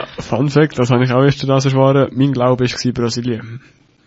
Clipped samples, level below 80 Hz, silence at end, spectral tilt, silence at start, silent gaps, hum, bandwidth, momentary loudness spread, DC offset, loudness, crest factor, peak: under 0.1%; -46 dBFS; 0.5 s; -6.5 dB/octave; 0 s; none; none; 8 kHz; 9 LU; under 0.1%; -15 LUFS; 14 dB; 0 dBFS